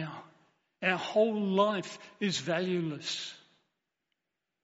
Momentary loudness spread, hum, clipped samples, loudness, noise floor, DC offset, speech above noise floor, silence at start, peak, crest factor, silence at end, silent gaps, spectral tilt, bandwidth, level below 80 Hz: 14 LU; none; under 0.1%; -31 LUFS; -87 dBFS; under 0.1%; 56 dB; 0 s; -14 dBFS; 20 dB; 1.25 s; none; -3.5 dB/octave; 8 kHz; -80 dBFS